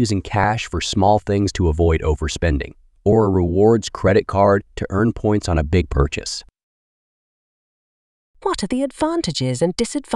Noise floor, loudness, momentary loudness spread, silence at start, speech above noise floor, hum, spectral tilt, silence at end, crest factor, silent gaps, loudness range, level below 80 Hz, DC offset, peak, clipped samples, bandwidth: under -90 dBFS; -19 LUFS; 8 LU; 0 s; over 72 dB; none; -6 dB/octave; 0 s; 16 dB; 6.63-8.34 s; 8 LU; -30 dBFS; under 0.1%; -2 dBFS; under 0.1%; 11.5 kHz